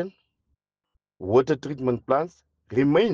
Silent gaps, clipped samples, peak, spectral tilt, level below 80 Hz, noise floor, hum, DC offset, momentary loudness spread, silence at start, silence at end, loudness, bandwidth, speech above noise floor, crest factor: none; under 0.1%; -8 dBFS; -7.5 dB/octave; -60 dBFS; -76 dBFS; none; under 0.1%; 14 LU; 0 s; 0 s; -24 LUFS; 7.2 kHz; 54 dB; 18 dB